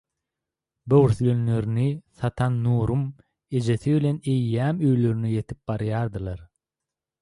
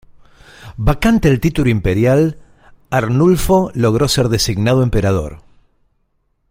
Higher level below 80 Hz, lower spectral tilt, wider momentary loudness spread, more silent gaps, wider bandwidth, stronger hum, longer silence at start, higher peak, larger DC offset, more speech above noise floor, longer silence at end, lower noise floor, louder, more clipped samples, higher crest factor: second, -48 dBFS vs -28 dBFS; first, -9 dB/octave vs -6 dB/octave; first, 10 LU vs 7 LU; neither; second, 11 kHz vs 16.5 kHz; neither; first, 0.85 s vs 0.6 s; second, -6 dBFS vs -2 dBFS; neither; first, 65 dB vs 50 dB; second, 0.75 s vs 1.15 s; first, -88 dBFS vs -63 dBFS; second, -24 LUFS vs -15 LUFS; neither; about the same, 18 dB vs 14 dB